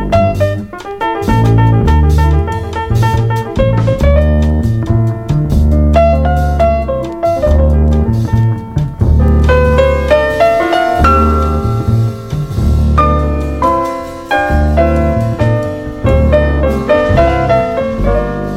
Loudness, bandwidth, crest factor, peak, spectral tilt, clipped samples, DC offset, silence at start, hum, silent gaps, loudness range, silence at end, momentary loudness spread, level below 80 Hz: -12 LUFS; 13 kHz; 10 dB; 0 dBFS; -8 dB/octave; under 0.1%; under 0.1%; 0 s; none; none; 2 LU; 0 s; 7 LU; -18 dBFS